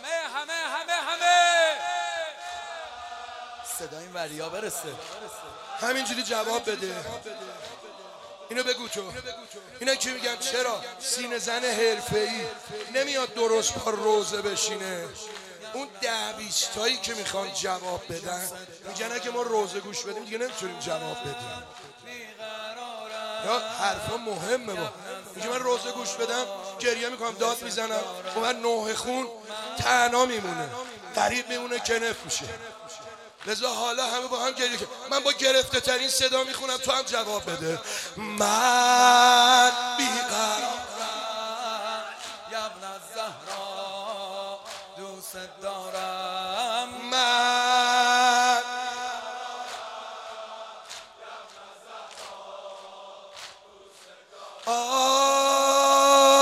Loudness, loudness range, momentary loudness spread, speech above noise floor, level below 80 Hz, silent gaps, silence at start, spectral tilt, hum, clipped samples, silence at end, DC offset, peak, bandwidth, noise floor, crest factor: -25 LUFS; 13 LU; 20 LU; 24 dB; -64 dBFS; none; 0 s; -1 dB/octave; none; under 0.1%; 0 s; under 0.1%; -4 dBFS; 16 kHz; -51 dBFS; 22 dB